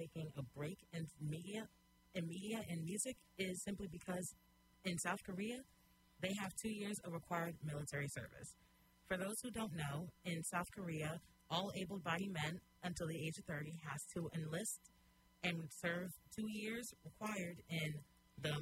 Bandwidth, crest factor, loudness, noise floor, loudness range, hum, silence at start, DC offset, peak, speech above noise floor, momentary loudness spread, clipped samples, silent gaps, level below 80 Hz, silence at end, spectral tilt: 16 kHz; 22 dB; -46 LUFS; -72 dBFS; 2 LU; none; 0 s; under 0.1%; -24 dBFS; 27 dB; 7 LU; under 0.1%; none; -72 dBFS; 0 s; -4.5 dB/octave